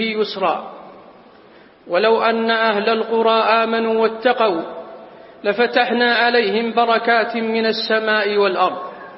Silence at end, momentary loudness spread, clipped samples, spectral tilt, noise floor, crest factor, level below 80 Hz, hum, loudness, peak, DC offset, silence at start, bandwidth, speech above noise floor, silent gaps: 0 s; 9 LU; under 0.1%; -7.5 dB/octave; -46 dBFS; 16 dB; -66 dBFS; none; -17 LUFS; -2 dBFS; under 0.1%; 0 s; 5.8 kHz; 29 dB; none